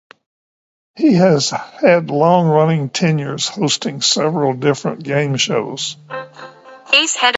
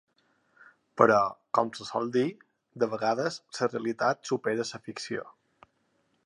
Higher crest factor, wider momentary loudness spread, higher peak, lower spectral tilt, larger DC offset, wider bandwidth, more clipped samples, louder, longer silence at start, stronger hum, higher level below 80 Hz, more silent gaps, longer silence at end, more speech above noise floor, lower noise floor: second, 16 dB vs 26 dB; about the same, 11 LU vs 13 LU; first, 0 dBFS vs -4 dBFS; about the same, -4 dB/octave vs -5 dB/octave; neither; second, 8.2 kHz vs 11.5 kHz; neither; first, -15 LUFS vs -29 LUFS; about the same, 0.95 s vs 0.95 s; neither; first, -62 dBFS vs -76 dBFS; neither; second, 0 s vs 0.95 s; first, over 75 dB vs 44 dB; first, under -90 dBFS vs -72 dBFS